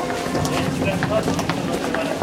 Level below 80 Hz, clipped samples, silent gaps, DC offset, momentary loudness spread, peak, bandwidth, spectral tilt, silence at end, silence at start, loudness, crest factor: -42 dBFS; under 0.1%; none; under 0.1%; 2 LU; -2 dBFS; 16.5 kHz; -5 dB/octave; 0 s; 0 s; -22 LUFS; 18 dB